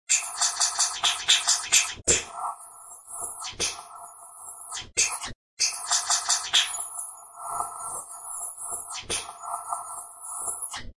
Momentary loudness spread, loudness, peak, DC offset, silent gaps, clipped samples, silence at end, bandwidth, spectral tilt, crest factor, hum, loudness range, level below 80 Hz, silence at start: 18 LU; -25 LUFS; -4 dBFS; under 0.1%; 5.35-5.57 s; under 0.1%; 0.05 s; 12 kHz; 1.5 dB/octave; 26 dB; none; 9 LU; -56 dBFS; 0.1 s